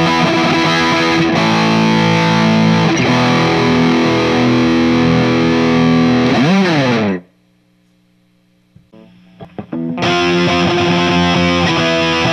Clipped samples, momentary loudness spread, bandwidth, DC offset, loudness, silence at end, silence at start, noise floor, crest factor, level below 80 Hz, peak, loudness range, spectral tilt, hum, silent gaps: under 0.1%; 3 LU; 12 kHz; under 0.1%; -12 LUFS; 0 s; 0 s; -54 dBFS; 12 dB; -42 dBFS; 0 dBFS; 8 LU; -5.5 dB/octave; 60 Hz at -45 dBFS; none